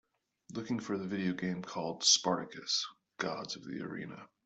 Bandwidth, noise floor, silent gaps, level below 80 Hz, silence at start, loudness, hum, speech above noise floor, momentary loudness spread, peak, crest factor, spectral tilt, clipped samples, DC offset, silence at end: 8.2 kHz; -59 dBFS; none; -76 dBFS; 0.5 s; -34 LUFS; none; 24 dB; 17 LU; -12 dBFS; 24 dB; -2.5 dB/octave; under 0.1%; under 0.1%; 0.2 s